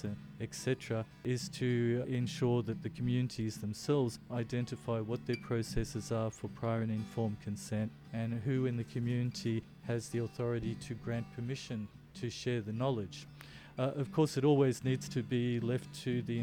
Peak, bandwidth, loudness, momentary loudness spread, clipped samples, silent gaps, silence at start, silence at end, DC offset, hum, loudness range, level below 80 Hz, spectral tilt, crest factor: -18 dBFS; 16 kHz; -36 LUFS; 8 LU; under 0.1%; none; 0 s; 0 s; under 0.1%; none; 5 LU; -58 dBFS; -6.5 dB/octave; 16 dB